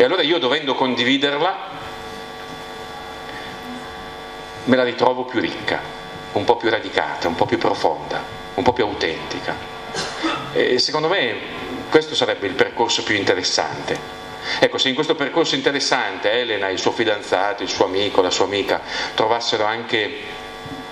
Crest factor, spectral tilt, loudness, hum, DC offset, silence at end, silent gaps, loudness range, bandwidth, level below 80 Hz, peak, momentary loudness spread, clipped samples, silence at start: 20 dB; -3.5 dB/octave; -20 LUFS; none; under 0.1%; 0 s; none; 4 LU; 13.5 kHz; -50 dBFS; 0 dBFS; 15 LU; under 0.1%; 0 s